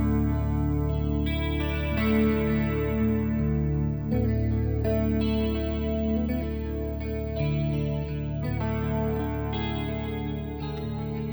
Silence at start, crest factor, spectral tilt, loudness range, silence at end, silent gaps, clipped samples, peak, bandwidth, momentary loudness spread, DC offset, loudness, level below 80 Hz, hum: 0 s; 14 dB; -9.5 dB/octave; 3 LU; 0 s; none; under 0.1%; -12 dBFS; over 20 kHz; 6 LU; under 0.1%; -28 LUFS; -34 dBFS; none